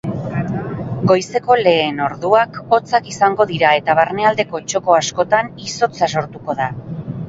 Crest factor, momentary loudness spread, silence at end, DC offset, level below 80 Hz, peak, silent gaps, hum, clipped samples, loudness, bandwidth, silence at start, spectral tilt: 16 dB; 9 LU; 0 s; under 0.1%; -50 dBFS; 0 dBFS; none; none; under 0.1%; -16 LUFS; 8 kHz; 0.05 s; -4.5 dB/octave